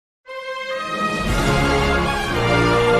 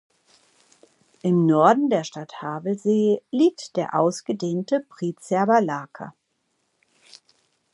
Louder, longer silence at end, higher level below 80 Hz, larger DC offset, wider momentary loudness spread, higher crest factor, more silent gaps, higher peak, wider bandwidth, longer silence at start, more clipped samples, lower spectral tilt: first, -19 LUFS vs -22 LUFS; second, 0 s vs 1.65 s; first, -30 dBFS vs -76 dBFS; neither; second, 12 LU vs 15 LU; second, 14 dB vs 22 dB; neither; second, -6 dBFS vs -2 dBFS; first, 14 kHz vs 11.5 kHz; second, 0.3 s vs 1.25 s; neither; second, -5 dB/octave vs -6.5 dB/octave